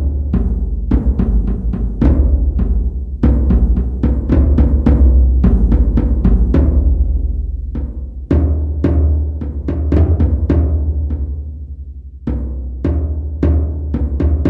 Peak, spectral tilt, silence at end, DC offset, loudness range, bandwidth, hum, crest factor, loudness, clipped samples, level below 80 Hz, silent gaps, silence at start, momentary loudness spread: -2 dBFS; -11.5 dB/octave; 0 s; under 0.1%; 6 LU; 2.9 kHz; none; 12 dB; -16 LUFS; under 0.1%; -14 dBFS; none; 0 s; 11 LU